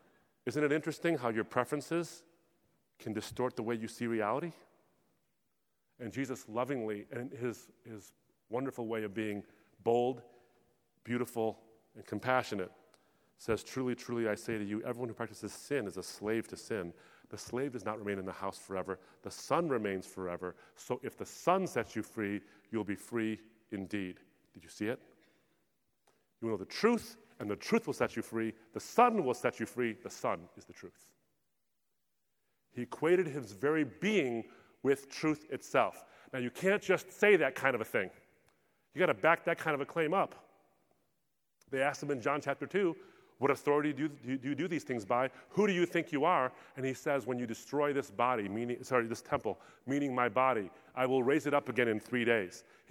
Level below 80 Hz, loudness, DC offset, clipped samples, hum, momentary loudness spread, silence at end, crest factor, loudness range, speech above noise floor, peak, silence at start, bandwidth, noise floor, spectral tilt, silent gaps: -74 dBFS; -35 LUFS; under 0.1%; under 0.1%; none; 14 LU; 0.3 s; 24 dB; 8 LU; 50 dB; -12 dBFS; 0.45 s; 18.5 kHz; -85 dBFS; -5.5 dB/octave; none